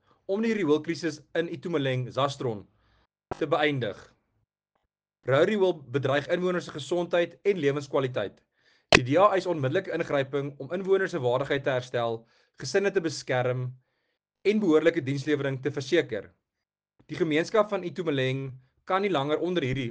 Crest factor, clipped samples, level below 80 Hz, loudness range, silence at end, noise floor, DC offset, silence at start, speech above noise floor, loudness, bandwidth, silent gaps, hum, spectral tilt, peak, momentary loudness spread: 26 dB; under 0.1%; -60 dBFS; 4 LU; 0 s; -88 dBFS; under 0.1%; 0.3 s; 61 dB; -27 LUFS; 9.6 kHz; none; none; -5.5 dB/octave; -2 dBFS; 11 LU